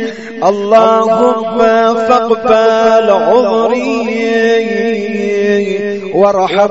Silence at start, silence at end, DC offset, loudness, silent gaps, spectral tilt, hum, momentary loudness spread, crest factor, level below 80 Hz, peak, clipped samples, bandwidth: 0 s; 0 s; 0.6%; -11 LUFS; none; -5.5 dB/octave; none; 7 LU; 10 dB; -52 dBFS; 0 dBFS; 0.2%; 8 kHz